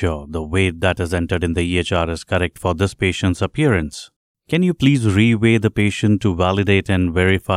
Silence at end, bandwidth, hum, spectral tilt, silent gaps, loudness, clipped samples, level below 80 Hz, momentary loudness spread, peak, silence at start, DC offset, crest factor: 0 s; 13 kHz; none; -6.5 dB/octave; 4.16-4.35 s; -18 LUFS; under 0.1%; -36 dBFS; 6 LU; -2 dBFS; 0 s; under 0.1%; 16 dB